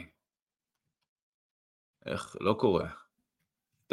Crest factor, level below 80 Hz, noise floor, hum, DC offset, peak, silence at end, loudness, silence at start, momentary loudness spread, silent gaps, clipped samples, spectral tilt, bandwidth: 24 dB; -62 dBFS; under -90 dBFS; none; under 0.1%; -12 dBFS; 0.95 s; -32 LUFS; 0 s; 18 LU; 0.42-0.47 s, 1.08-1.16 s, 1.22-1.94 s; under 0.1%; -6.5 dB/octave; 12 kHz